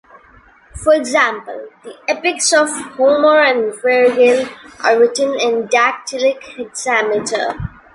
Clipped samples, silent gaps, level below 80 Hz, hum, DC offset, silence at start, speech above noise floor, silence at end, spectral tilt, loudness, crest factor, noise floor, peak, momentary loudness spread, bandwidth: under 0.1%; none; -44 dBFS; none; under 0.1%; 0.75 s; 32 dB; 0.25 s; -2.5 dB/octave; -14 LUFS; 14 dB; -47 dBFS; 0 dBFS; 16 LU; 11.5 kHz